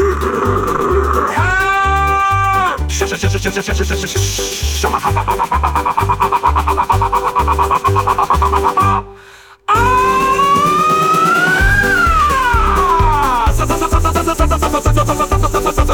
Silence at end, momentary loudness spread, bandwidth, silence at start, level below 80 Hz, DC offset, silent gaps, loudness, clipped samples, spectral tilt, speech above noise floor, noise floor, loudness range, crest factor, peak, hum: 0 s; 5 LU; 18 kHz; 0 s; -22 dBFS; under 0.1%; none; -13 LUFS; under 0.1%; -4.5 dB/octave; 24 dB; -40 dBFS; 4 LU; 14 dB; 0 dBFS; none